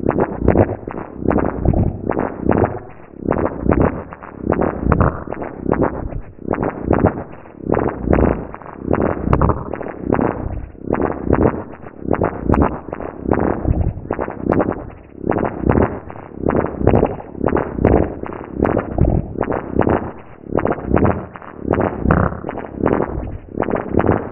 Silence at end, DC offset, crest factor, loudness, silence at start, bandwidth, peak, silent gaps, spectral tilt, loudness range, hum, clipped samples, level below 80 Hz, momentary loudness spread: 0 s; 0.4%; 18 dB; -19 LUFS; 0 s; 3.2 kHz; 0 dBFS; none; -12 dB/octave; 2 LU; none; under 0.1%; -28 dBFS; 13 LU